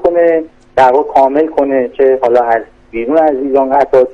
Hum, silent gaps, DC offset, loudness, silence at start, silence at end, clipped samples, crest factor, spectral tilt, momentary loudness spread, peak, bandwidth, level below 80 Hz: none; none; under 0.1%; -11 LUFS; 0 s; 0 s; under 0.1%; 10 dB; -6.5 dB/octave; 7 LU; 0 dBFS; 8 kHz; -44 dBFS